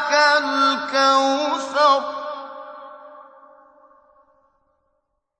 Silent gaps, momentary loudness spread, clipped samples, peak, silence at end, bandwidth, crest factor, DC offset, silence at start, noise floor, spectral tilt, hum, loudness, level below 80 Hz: none; 22 LU; under 0.1%; -2 dBFS; 2.2 s; 9.4 kHz; 20 dB; under 0.1%; 0 s; -73 dBFS; -1 dB/octave; none; -18 LUFS; -74 dBFS